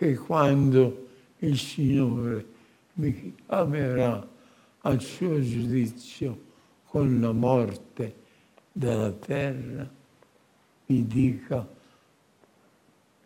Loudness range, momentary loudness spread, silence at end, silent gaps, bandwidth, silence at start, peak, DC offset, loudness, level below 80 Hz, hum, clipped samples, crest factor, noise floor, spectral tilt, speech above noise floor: 5 LU; 14 LU; 1.5 s; none; 15.5 kHz; 0 s; -6 dBFS; under 0.1%; -27 LUFS; -56 dBFS; none; under 0.1%; 20 dB; -63 dBFS; -7.5 dB/octave; 38 dB